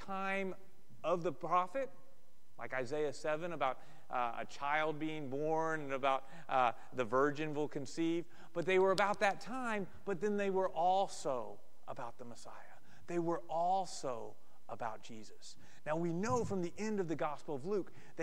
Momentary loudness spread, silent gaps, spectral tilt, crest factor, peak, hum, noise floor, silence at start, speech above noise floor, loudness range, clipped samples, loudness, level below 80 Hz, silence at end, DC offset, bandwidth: 17 LU; none; -5.5 dB/octave; 20 dB; -16 dBFS; none; -71 dBFS; 0 s; 33 dB; 6 LU; under 0.1%; -38 LUFS; -72 dBFS; 0 s; 0.7%; 16 kHz